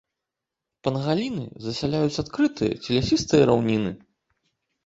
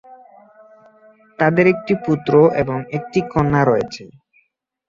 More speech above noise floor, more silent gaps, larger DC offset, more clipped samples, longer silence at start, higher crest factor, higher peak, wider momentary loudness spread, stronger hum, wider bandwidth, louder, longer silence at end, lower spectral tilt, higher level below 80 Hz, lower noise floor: first, 63 dB vs 48 dB; neither; neither; neither; first, 0.85 s vs 0.1 s; about the same, 20 dB vs 18 dB; about the same, -4 dBFS vs -2 dBFS; first, 12 LU vs 9 LU; neither; about the same, 8 kHz vs 7.4 kHz; second, -24 LUFS vs -17 LUFS; about the same, 0.9 s vs 0.8 s; second, -6 dB/octave vs -8 dB/octave; about the same, -50 dBFS vs -48 dBFS; first, -86 dBFS vs -64 dBFS